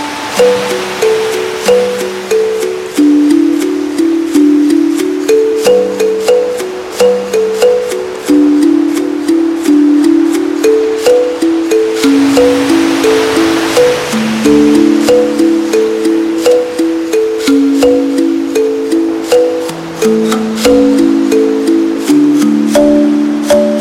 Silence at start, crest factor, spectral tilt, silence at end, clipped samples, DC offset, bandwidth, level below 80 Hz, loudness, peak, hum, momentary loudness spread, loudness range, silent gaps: 0 s; 10 dB; -4.5 dB/octave; 0 s; under 0.1%; under 0.1%; 16 kHz; -44 dBFS; -10 LUFS; 0 dBFS; none; 5 LU; 2 LU; none